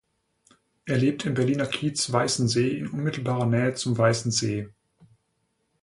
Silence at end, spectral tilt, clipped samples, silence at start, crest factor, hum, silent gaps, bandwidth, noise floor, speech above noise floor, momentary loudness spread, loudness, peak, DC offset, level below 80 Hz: 1.15 s; -5 dB/octave; under 0.1%; 0.85 s; 20 dB; none; none; 11.5 kHz; -74 dBFS; 49 dB; 6 LU; -25 LUFS; -6 dBFS; under 0.1%; -60 dBFS